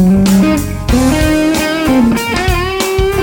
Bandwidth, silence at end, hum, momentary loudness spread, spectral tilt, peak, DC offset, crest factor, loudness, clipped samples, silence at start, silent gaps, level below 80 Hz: 17.5 kHz; 0 s; none; 5 LU; -5.5 dB/octave; 0 dBFS; under 0.1%; 10 dB; -12 LUFS; under 0.1%; 0 s; none; -22 dBFS